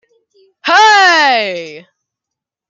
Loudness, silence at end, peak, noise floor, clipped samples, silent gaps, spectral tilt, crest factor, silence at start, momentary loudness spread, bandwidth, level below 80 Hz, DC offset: -8 LUFS; 0.9 s; 0 dBFS; -82 dBFS; under 0.1%; none; -0.5 dB/octave; 14 dB; 0.65 s; 18 LU; 7.8 kHz; -72 dBFS; under 0.1%